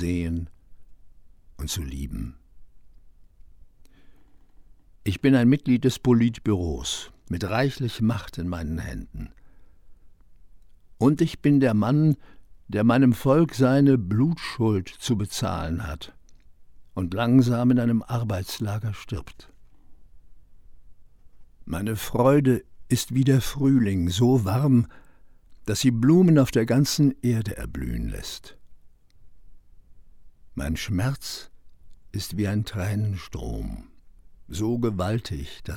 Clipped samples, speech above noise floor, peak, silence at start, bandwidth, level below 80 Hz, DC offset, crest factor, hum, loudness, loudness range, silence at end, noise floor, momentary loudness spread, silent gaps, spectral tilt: under 0.1%; 27 dB; -6 dBFS; 0 s; 17 kHz; -42 dBFS; under 0.1%; 18 dB; none; -24 LUFS; 15 LU; 0 s; -50 dBFS; 16 LU; none; -6.5 dB/octave